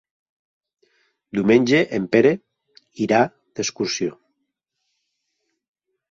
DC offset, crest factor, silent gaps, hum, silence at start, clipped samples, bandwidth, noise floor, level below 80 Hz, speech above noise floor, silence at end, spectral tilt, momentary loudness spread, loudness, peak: under 0.1%; 20 dB; none; none; 1.35 s; under 0.1%; 7.6 kHz; -77 dBFS; -62 dBFS; 58 dB; 2 s; -5 dB/octave; 12 LU; -20 LUFS; -2 dBFS